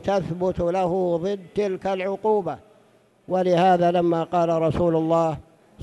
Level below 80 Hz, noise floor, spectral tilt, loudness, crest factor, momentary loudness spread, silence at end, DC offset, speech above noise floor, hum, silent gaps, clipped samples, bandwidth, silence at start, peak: -50 dBFS; -58 dBFS; -7.5 dB/octave; -22 LUFS; 14 dB; 8 LU; 0 s; under 0.1%; 36 dB; none; none; under 0.1%; 11.5 kHz; 0 s; -8 dBFS